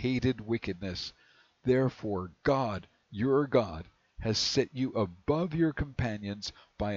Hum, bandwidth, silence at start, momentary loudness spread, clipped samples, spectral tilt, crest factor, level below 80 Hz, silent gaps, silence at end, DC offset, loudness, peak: none; 7.8 kHz; 0 s; 11 LU; under 0.1%; -5.5 dB/octave; 18 dB; -50 dBFS; none; 0 s; under 0.1%; -31 LUFS; -12 dBFS